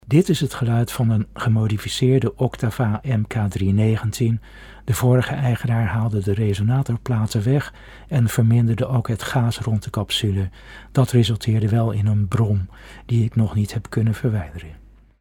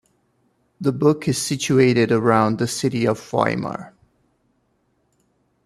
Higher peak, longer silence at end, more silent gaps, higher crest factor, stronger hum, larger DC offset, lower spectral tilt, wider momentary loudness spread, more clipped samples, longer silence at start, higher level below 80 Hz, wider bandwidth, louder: about the same, -4 dBFS vs -2 dBFS; second, 0.45 s vs 1.75 s; neither; about the same, 16 dB vs 20 dB; neither; neither; about the same, -6.5 dB/octave vs -5.5 dB/octave; second, 6 LU vs 9 LU; neither; second, 0.05 s vs 0.8 s; first, -42 dBFS vs -58 dBFS; first, 17 kHz vs 14.5 kHz; about the same, -21 LUFS vs -19 LUFS